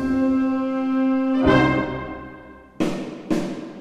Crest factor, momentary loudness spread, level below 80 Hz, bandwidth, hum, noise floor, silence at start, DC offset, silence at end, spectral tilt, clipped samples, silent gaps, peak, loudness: 18 dB; 16 LU; -44 dBFS; 10 kHz; none; -43 dBFS; 0 s; under 0.1%; 0 s; -7 dB/octave; under 0.1%; none; -4 dBFS; -22 LUFS